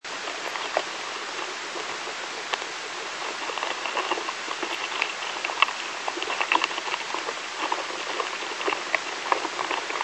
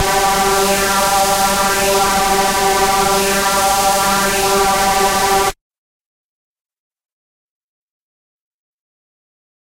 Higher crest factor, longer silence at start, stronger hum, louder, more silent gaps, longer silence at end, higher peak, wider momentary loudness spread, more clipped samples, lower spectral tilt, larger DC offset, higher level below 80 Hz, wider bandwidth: first, 30 dB vs 14 dB; about the same, 0.05 s vs 0 s; neither; second, -28 LUFS vs -13 LUFS; neither; second, 0 s vs 4.15 s; about the same, 0 dBFS vs -2 dBFS; first, 8 LU vs 1 LU; neither; second, 0 dB/octave vs -2 dB/octave; neither; second, -76 dBFS vs -36 dBFS; second, 12 kHz vs 16 kHz